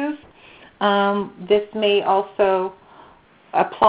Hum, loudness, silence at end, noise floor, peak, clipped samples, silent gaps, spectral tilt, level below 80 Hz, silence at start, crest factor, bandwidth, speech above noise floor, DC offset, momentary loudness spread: none; -20 LUFS; 0 s; -50 dBFS; 0 dBFS; under 0.1%; none; -2.5 dB/octave; -60 dBFS; 0 s; 20 dB; 5 kHz; 32 dB; under 0.1%; 9 LU